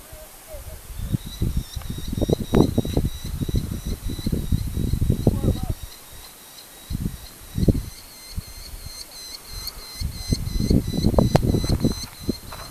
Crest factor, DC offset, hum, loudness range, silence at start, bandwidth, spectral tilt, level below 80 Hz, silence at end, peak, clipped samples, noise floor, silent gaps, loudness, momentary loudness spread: 24 dB; under 0.1%; none; 6 LU; 0 s; 15 kHz; -6.5 dB/octave; -30 dBFS; 0 s; 0 dBFS; under 0.1%; -43 dBFS; none; -25 LUFS; 19 LU